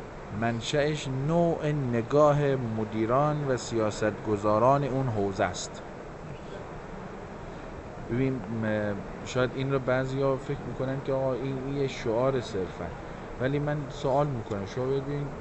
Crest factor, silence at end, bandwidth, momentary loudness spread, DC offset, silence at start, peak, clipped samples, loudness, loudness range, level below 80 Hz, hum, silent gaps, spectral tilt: 18 dB; 0 s; 8.2 kHz; 16 LU; under 0.1%; 0 s; -10 dBFS; under 0.1%; -28 LUFS; 8 LU; -48 dBFS; none; none; -6.5 dB/octave